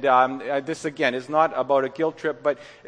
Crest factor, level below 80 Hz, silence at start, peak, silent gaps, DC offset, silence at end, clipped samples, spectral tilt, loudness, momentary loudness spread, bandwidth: 18 dB; -70 dBFS; 0 s; -6 dBFS; none; under 0.1%; 0 s; under 0.1%; -5 dB/octave; -23 LUFS; 7 LU; 10.5 kHz